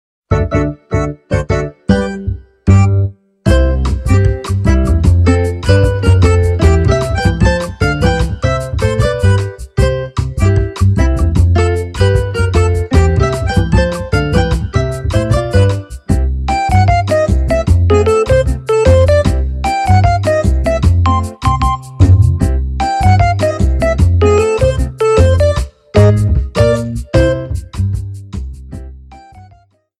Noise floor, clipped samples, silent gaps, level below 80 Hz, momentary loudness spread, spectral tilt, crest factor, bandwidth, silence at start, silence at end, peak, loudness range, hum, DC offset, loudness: -47 dBFS; under 0.1%; none; -18 dBFS; 8 LU; -7 dB/octave; 12 dB; 11.5 kHz; 0.3 s; 0.6 s; 0 dBFS; 3 LU; none; under 0.1%; -13 LUFS